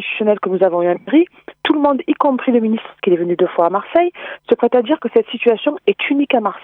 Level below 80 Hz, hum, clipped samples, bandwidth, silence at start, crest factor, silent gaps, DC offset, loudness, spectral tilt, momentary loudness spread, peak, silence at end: -64 dBFS; none; under 0.1%; 4.1 kHz; 0 s; 14 dB; none; under 0.1%; -16 LUFS; -8.5 dB/octave; 5 LU; -2 dBFS; 0.05 s